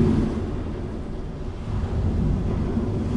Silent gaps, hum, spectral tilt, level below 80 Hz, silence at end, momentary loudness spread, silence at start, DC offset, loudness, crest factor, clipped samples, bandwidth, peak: none; none; -9 dB/octave; -30 dBFS; 0 s; 9 LU; 0 s; under 0.1%; -27 LUFS; 16 dB; under 0.1%; 10.5 kHz; -8 dBFS